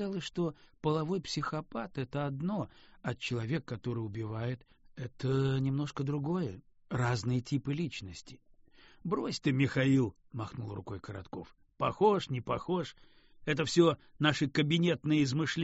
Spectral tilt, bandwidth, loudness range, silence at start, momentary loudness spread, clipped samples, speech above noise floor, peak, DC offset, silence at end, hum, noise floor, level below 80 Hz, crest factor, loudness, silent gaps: -5.5 dB/octave; 8 kHz; 6 LU; 0 s; 15 LU; under 0.1%; 27 dB; -12 dBFS; under 0.1%; 0 s; none; -59 dBFS; -62 dBFS; 20 dB; -33 LUFS; none